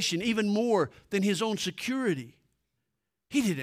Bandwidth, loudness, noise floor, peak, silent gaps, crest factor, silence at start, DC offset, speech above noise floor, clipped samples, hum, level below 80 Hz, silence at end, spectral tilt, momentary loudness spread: 16 kHz; -29 LUFS; -84 dBFS; -14 dBFS; none; 16 dB; 0 s; under 0.1%; 56 dB; under 0.1%; none; -68 dBFS; 0 s; -4.5 dB/octave; 5 LU